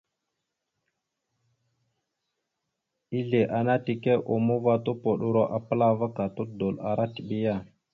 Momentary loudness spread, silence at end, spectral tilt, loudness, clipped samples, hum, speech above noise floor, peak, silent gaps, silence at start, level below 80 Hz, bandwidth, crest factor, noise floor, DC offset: 7 LU; 0.3 s; -10 dB/octave; -27 LUFS; under 0.1%; none; 57 dB; -10 dBFS; none; 3.1 s; -64 dBFS; 4.8 kHz; 18 dB; -83 dBFS; under 0.1%